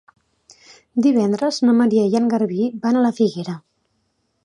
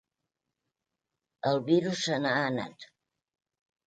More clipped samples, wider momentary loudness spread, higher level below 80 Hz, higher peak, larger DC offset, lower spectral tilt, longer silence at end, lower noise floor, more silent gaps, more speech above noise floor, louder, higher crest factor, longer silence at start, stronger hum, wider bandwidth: neither; about the same, 11 LU vs 9 LU; first, -68 dBFS vs -74 dBFS; first, -4 dBFS vs -12 dBFS; neither; first, -6.5 dB/octave vs -5 dB/octave; second, 0.85 s vs 1 s; second, -69 dBFS vs -87 dBFS; neither; second, 51 dB vs 59 dB; first, -18 LUFS vs -29 LUFS; second, 14 dB vs 20 dB; second, 0.95 s vs 1.45 s; neither; first, 10.5 kHz vs 9.2 kHz